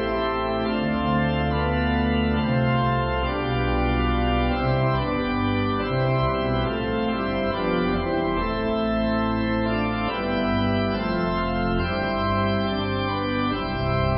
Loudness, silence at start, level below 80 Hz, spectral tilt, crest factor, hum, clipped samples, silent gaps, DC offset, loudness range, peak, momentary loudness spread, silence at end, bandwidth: -24 LUFS; 0 s; -34 dBFS; -11.5 dB/octave; 14 dB; none; under 0.1%; none; under 0.1%; 1 LU; -10 dBFS; 3 LU; 0 s; 5.6 kHz